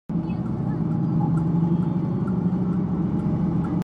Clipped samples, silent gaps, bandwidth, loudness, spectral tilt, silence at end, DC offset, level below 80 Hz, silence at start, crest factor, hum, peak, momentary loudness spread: under 0.1%; none; 4.3 kHz; -24 LUFS; -11 dB/octave; 0 s; under 0.1%; -44 dBFS; 0.1 s; 12 dB; none; -12 dBFS; 4 LU